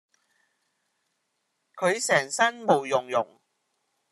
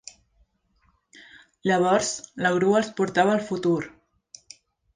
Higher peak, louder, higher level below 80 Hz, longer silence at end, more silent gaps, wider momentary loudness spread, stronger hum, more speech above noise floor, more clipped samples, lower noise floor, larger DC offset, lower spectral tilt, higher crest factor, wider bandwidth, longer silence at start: about the same, -6 dBFS vs -6 dBFS; about the same, -25 LUFS vs -23 LUFS; second, -82 dBFS vs -64 dBFS; second, 0.9 s vs 1.05 s; neither; second, 7 LU vs 20 LU; neither; first, 53 dB vs 44 dB; neither; first, -77 dBFS vs -67 dBFS; neither; second, -3 dB/octave vs -4.5 dB/octave; about the same, 22 dB vs 20 dB; first, 13 kHz vs 9.8 kHz; about the same, 1.75 s vs 1.65 s